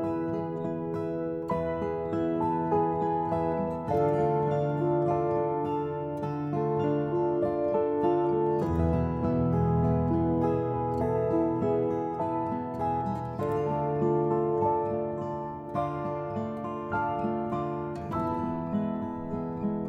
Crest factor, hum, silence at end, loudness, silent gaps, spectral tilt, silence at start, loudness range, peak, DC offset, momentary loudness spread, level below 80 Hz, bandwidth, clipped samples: 14 dB; none; 0 s; -29 LUFS; none; -10 dB/octave; 0 s; 5 LU; -14 dBFS; under 0.1%; 7 LU; -48 dBFS; 7.4 kHz; under 0.1%